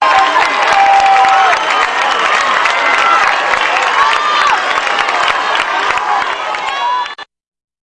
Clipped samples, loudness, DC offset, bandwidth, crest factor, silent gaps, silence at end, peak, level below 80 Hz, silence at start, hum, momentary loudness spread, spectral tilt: under 0.1%; -11 LUFS; under 0.1%; 11 kHz; 12 dB; none; 0.7 s; 0 dBFS; -50 dBFS; 0 s; none; 8 LU; -0.5 dB/octave